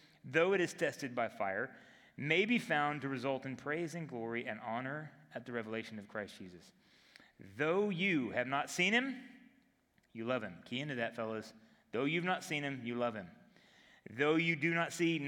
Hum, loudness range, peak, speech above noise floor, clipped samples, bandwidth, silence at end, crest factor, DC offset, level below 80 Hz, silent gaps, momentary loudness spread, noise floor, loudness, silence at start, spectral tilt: none; 6 LU; -14 dBFS; 37 dB; under 0.1%; 17.5 kHz; 0 s; 22 dB; under 0.1%; -82 dBFS; none; 17 LU; -74 dBFS; -36 LUFS; 0.25 s; -5 dB/octave